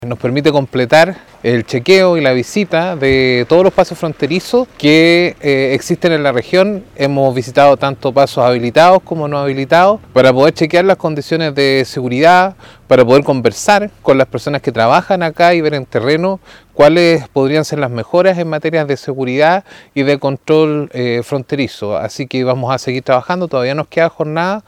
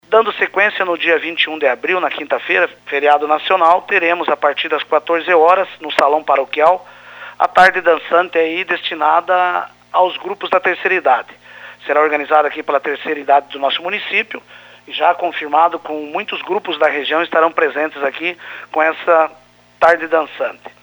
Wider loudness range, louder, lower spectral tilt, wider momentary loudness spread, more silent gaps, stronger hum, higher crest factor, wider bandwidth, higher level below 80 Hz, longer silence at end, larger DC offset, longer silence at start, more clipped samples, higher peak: about the same, 4 LU vs 3 LU; first, -12 LUFS vs -15 LUFS; first, -5.5 dB/octave vs -4 dB/octave; about the same, 9 LU vs 10 LU; neither; second, none vs 60 Hz at -60 dBFS; about the same, 12 dB vs 16 dB; second, 16 kHz vs over 20 kHz; first, -48 dBFS vs -62 dBFS; about the same, 0.05 s vs 0.15 s; neither; about the same, 0 s vs 0.1 s; first, 0.9% vs under 0.1%; about the same, 0 dBFS vs 0 dBFS